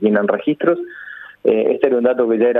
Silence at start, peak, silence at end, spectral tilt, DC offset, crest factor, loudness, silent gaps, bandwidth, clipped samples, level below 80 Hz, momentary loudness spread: 0 s; 0 dBFS; 0 s; -9.5 dB/octave; under 0.1%; 16 dB; -17 LUFS; none; 3.9 kHz; under 0.1%; -64 dBFS; 15 LU